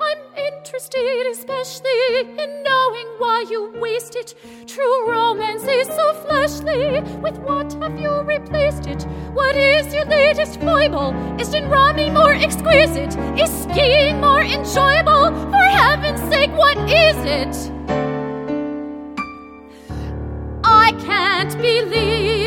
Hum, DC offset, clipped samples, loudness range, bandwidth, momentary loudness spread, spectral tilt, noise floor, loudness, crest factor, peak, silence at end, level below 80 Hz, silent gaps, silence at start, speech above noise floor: none; under 0.1%; under 0.1%; 7 LU; 18 kHz; 14 LU; -4.5 dB/octave; -39 dBFS; -17 LUFS; 16 dB; 0 dBFS; 0 s; -34 dBFS; none; 0 s; 22 dB